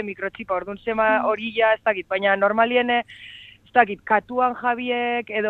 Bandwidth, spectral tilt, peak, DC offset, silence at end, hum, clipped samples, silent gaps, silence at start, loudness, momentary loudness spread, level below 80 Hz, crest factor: 4.5 kHz; -6.5 dB/octave; -2 dBFS; under 0.1%; 0 s; none; under 0.1%; none; 0 s; -21 LUFS; 9 LU; -60 dBFS; 20 dB